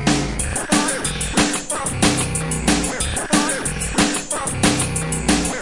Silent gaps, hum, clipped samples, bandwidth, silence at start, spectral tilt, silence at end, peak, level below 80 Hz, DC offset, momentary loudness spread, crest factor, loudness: none; none; under 0.1%; 11.5 kHz; 0 s; -3 dB/octave; 0 s; -2 dBFS; -32 dBFS; 0.3%; 4 LU; 18 dB; -19 LUFS